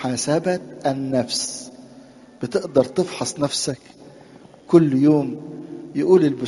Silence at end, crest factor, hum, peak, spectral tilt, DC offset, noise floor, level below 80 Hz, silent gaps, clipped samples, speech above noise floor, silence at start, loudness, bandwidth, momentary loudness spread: 0 s; 20 dB; none; 0 dBFS; -5 dB/octave; under 0.1%; -46 dBFS; -60 dBFS; none; under 0.1%; 26 dB; 0 s; -20 LUFS; 11.5 kHz; 17 LU